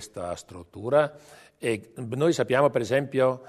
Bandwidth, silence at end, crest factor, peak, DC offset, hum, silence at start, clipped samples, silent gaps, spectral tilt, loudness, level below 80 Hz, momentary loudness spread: 13.5 kHz; 0 s; 18 dB; -8 dBFS; under 0.1%; none; 0 s; under 0.1%; none; -5.5 dB/octave; -26 LUFS; -64 dBFS; 13 LU